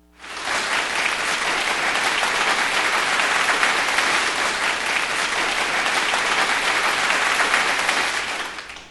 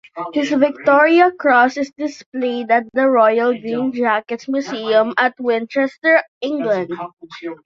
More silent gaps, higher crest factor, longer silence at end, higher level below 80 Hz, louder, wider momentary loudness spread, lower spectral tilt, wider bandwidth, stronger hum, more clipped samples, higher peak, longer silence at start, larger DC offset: second, none vs 2.26-2.32 s, 5.98-6.02 s, 6.28-6.41 s, 7.13-7.17 s; about the same, 18 dB vs 16 dB; about the same, 0 s vs 0.1 s; first, -54 dBFS vs -66 dBFS; about the same, -19 LUFS vs -17 LUFS; second, 5 LU vs 11 LU; second, 0 dB/octave vs -5 dB/octave; first, 12.5 kHz vs 7.6 kHz; neither; neither; about the same, -4 dBFS vs -2 dBFS; about the same, 0.2 s vs 0.15 s; neither